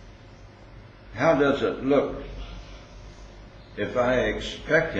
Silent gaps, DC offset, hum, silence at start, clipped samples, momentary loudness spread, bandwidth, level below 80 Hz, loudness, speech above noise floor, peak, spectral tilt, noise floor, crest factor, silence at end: none; under 0.1%; none; 0 s; under 0.1%; 24 LU; 8 kHz; -44 dBFS; -24 LUFS; 24 dB; -8 dBFS; -6 dB/octave; -47 dBFS; 20 dB; 0 s